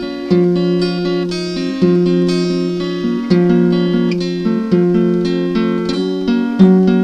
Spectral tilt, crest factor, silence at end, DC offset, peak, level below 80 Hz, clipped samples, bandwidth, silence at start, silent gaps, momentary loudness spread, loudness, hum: -8 dB/octave; 14 dB; 0 s; under 0.1%; 0 dBFS; -44 dBFS; under 0.1%; 9 kHz; 0 s; none; 7 LU; -15 LUFS; none